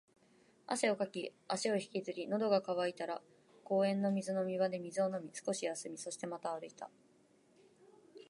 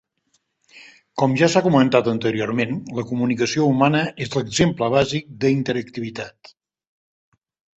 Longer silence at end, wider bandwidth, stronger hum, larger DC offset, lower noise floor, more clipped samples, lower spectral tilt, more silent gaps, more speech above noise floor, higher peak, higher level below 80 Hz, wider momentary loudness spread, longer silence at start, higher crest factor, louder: second, 0.05 s vs 1.45 s; first, 11.5 kHz vs 8.4 kHz; neither; neither; about the same, -69 dBFS vs -68 dBFS; neither; about the same, -4.5 dB/octave vs -5.5 dB/octave; neither; second, 32 dB vs 49 dB; second, -16 dBFS vs -2 dBFS; second, -90 dBFS vs -52 dBFS; about the same, 11 LU vs 12 LU; about the same, 0.7 s vs 0.75 s; about the same, 22 dB vs 20 dB; second, -38 LUFS vs -20 LUFS